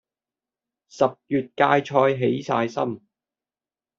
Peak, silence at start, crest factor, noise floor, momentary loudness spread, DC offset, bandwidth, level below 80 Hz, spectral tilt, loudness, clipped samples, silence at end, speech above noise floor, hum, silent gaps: -2 dBFS; 0.95 s; 22 dB; under -90 dBFS; 9 LU; under 0.1%; 7.6 kHz; -66 dBFS; -5 dB/octave; -22 LUFS; under 0.1%; 1 s; over 68 dB; none; none